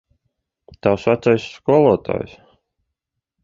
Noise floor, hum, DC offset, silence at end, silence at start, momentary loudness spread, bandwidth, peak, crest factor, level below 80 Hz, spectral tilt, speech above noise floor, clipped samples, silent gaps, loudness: -80 dBFS; none; under 0.1%; 1.15 s; 0.85 s; 12 LU; 7.6 kHz; -2 dBFS; 18 dB; -50 dBFS; -7.5 dB/octave; 63 dB; under 0.1%; none; -18 LUFS